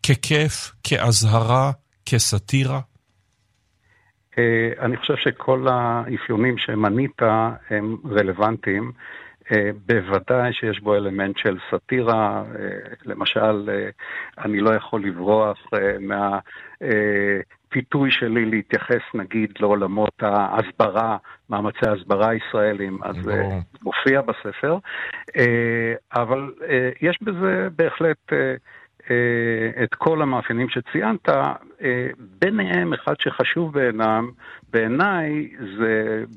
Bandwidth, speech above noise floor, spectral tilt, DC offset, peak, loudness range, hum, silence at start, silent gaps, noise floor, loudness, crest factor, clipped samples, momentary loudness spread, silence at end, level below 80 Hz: 14.5 kHz; 45 dB; -5 dB/octave; under 0.1%; -4 dBFS; 2 LU; none; 0.05 s; none; -66 dBFS; -21 LUFS; 18 dB; under 0.1%; 8 LU; 0 s; -56 dBFS